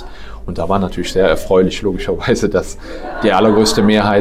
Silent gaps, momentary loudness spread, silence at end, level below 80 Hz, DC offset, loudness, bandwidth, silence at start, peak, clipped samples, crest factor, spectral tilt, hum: none; 16 LU; 0 s; -30 dBFS; under 0.1%; -14 LUFS; 15.5 kHz; 0 s; -2 dBFS; under 0.1%; 12 dB; -5 dB/octave; none